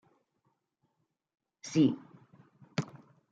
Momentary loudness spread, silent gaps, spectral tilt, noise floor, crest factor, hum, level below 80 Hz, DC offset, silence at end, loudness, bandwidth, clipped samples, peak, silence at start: 18 LU; none; -6.5 dB/octave; -81 dBFS; 22 dB; none; -80 dBFS; under 0.1%; 0.45 s; -32 LUFS; 9.2 kHz; under 0.1%; -14 dBFS; 1.65 s